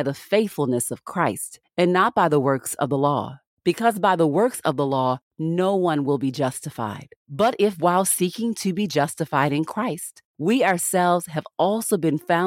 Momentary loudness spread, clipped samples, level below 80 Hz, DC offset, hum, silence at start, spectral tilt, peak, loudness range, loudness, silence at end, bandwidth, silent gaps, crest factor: 9 LU; under 0.1%; -66 dBFS; under 0.1%; none; 0 s; -5 dB/octave; -4 dBFS; 2 LU; -22 LUFS; 0 s; 17 kHz; 3.47-3.57 s, 5.22-5.31 s, 7.16-7.26 s, 10.25-10.34 s; 18 dB